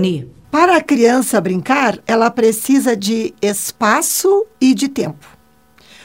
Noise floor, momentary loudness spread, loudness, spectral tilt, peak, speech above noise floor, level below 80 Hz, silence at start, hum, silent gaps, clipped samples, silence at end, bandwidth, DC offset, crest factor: -51 dBFS; 7 LU; -14 LUFS; -4 dB/octave; 0 dBFS; 36 dB; -56 dBFS; 0 s; none; none; under 0.1%; 0.9 s; 16.5 kHz; 0.2%; 14 dB